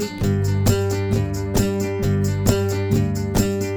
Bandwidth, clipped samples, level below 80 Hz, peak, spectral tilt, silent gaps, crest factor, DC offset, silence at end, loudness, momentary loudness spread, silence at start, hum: over 20 kHz; under 0.1%; -34 dBFS; -2 dBFS; -6 dB/octave; none; 18 dB; under 0.1%; 0 s; -21 LUFS; 3 LU; 0 s; none